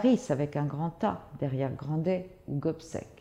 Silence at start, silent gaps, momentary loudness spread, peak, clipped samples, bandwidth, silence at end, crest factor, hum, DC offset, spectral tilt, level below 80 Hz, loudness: 0 s; none; 7 LU; -14 dBFS; under 0.1%; 11 kHz; 0.05 s; 18 dB; none; under 0.1%; -8 dB/octave; -60 dBFS; -32 LUFS